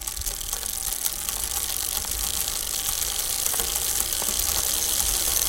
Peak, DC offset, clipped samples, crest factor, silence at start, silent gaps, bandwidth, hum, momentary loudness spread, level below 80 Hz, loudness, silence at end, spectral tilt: -2 dBFS; under 0.1%; under 0.1%; 24 dB; 0 s; none; 17.5 kHz; none; 5 LU; -40 dBFS; -23 LUFS; 0 s; 0 dB/octave